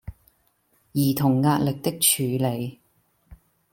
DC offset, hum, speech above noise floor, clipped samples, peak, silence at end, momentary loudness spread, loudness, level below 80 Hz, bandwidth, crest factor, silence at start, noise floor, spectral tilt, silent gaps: under 0.1%; none; 44 dB; under 0.1%; -6 dBFS; 0.35 s; 12 LU; -22 LUFS; -54 dBFS; 17 kHz; 20 dB; 0.05 s; -66 dBFS; -4.5 dB/octave; none